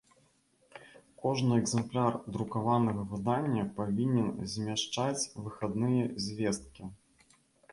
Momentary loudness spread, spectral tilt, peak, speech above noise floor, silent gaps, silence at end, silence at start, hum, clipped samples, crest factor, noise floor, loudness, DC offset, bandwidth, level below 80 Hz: 10 LU; -5.5 dB/octave; -16 dBFS; 38 dB; none; 0.8 s; 0.75 s; none; under 0.1%; 18 dB; -69 dBFS; -32 LUFS; under 0.1%; 11.5 kHz; -62 dBFS